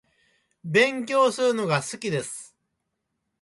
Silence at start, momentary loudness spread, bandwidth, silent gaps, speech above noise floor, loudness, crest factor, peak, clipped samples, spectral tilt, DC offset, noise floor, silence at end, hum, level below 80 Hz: 0.65 s; 15 LU; 11.5 kHz; none; 56 dB; -23 LUFS; 18 dB; -8 dBFS; under 0.1%; -4 dB/octave; under 0.1%; -79 dBFS; 0.95 s; none; -70 dBFS